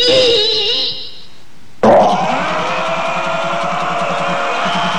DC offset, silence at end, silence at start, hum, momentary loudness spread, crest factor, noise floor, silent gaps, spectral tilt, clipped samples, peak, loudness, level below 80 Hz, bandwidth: 5%; 0 s; 0 s; none; 8 LU; 16 dB; -44 dBFS; none; -3.5 dB/octave; under 0.1%; 0 dBFS; -14 LUFS; -50 dBFS; 12 kHz